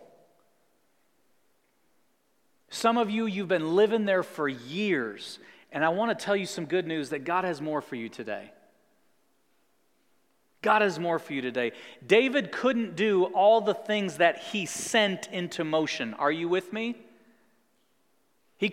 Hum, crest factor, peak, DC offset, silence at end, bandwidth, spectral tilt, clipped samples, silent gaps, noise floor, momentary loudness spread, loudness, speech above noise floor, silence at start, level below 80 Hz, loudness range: none; 22 dB; -8 dBFS; under 0.1%; 0 s; 16 kHz; -4.5 dB/octave; under 0.1%; none; -72 dBFS; 13 LU; -27 LUFS; 45 dB; 2.7 s; -82 dBFS; 8 LU